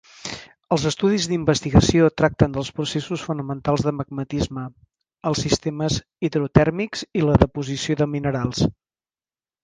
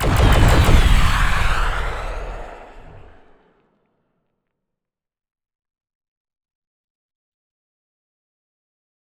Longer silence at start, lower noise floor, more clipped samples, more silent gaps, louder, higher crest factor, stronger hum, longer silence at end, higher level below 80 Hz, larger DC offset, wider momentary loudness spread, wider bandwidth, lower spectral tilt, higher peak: first, 0.25 s vs 0 s; first, under -90 dBFS vs -86 dBFS; neither; neither; second, -21 LUFS vs -17 LUFS; about the same, 22 dB vs 20 dB; neither; second, 0.95 s vs 6.2 s; second, -38 dBFS vs -22 dBFS; neither; second, 10 LU vs 18 LU; second, 9.8 kHz vs 15 kHz; about the same, -5.5 dB/octave vs -5 dB/octave; about the same, 0 dBFS vs 0 dBFS